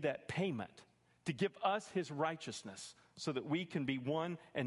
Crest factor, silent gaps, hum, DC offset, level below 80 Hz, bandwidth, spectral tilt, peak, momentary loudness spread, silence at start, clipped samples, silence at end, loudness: 18 dB; none; none; under 0.1%; -76 dBFS; 11.5 kHz; -5.5 dB/octave; -22 dBFS; 10 LU; 0 s; under 0.1%; 0 s; -40 LUFS